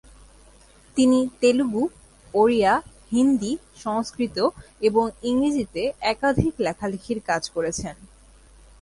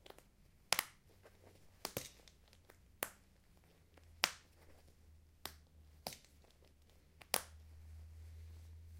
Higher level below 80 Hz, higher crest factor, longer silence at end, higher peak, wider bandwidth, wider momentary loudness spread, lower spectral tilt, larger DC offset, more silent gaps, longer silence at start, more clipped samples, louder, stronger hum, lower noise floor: first, -48 dBFS vs -64 dBFS; second, 20 dB vs 42 dB; first, 0.75 s vs 0 s; about the same, -4 dBFS vs -6 dBFS; second, 11.5 kHz vs 16 kHz; second, 10 LU vs 27 LU; first, -5 dB/octave vs -1 dB/octave; neither; neither; first, 0.95 s vs 0.05 s; neither; first, -23 LUFS vs -43 LUFS; neither; second, -52 dBFS vs -68 dBFS